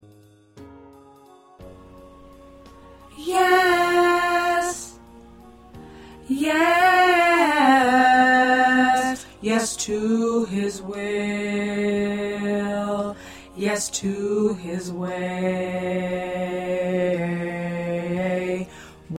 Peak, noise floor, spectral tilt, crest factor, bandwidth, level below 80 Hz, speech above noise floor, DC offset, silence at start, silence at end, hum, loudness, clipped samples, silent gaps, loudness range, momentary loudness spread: -6 dBFS; -52 dBFS; -4.5 dB/octave; 16 dB; 16.5 kHz; -54 dBFS; 29 dB; under 0.1%; 0.55 s; 0 s; none; -21 LUFS; under 0.1%; none; 9 LU; 13 LU